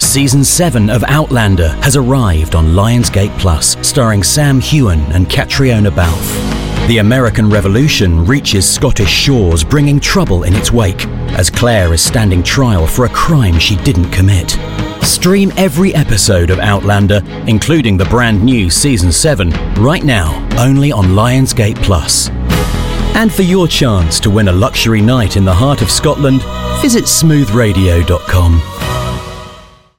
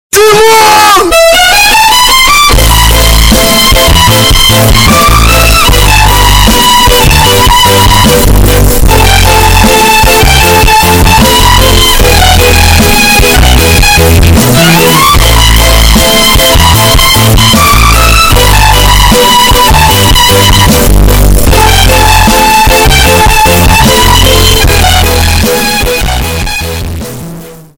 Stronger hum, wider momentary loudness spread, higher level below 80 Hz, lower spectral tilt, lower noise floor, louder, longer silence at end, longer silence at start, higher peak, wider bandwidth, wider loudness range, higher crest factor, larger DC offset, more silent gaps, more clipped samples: neither; about the same, 5 LU vs 3 LU; second, -20 dBFS vs -10 dBFS; first, -4.5 dB/octave vs -3 dB/octave; first, -36 dBFS vs -24 dBFS; second, -10 LUFS vs -3 LUFS; first, 0.35 s vs 0.2 s; second, 0 s vs 0.15 s; about the same, 0 dBFS vs 0 dBFS; second, 17 kHz vs over 20 kHz; about the same, 1 LU vs 1 LU; first, 10 dB vs 4 dB; second, 0.9% vs 2%; neither; second, under 0.1% vs 4%